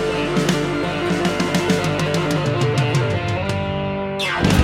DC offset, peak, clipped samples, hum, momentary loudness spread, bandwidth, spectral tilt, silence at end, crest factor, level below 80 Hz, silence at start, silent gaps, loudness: under 0.1%; -4 dBFS; under 0.1%; 50 Hz at -40 dBFS; 4 LU; 16.5 kHz; -5.5 dB/octave; 0 s; 16 dB; -40 dBFS; 0 s; none; -20 LUFS